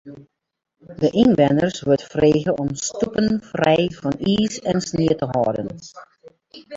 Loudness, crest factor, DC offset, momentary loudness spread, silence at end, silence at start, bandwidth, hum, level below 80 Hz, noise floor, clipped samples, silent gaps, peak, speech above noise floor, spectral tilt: -20 LUFS; 18 dB; under 0.1%; 8 LU; 0 s; 0.05 s; 7.8 kHz; none; -50 dBFS; -47 dBFS; under 0.1%; none; -2 dBFS; 27 dB; -5.5 dB/octave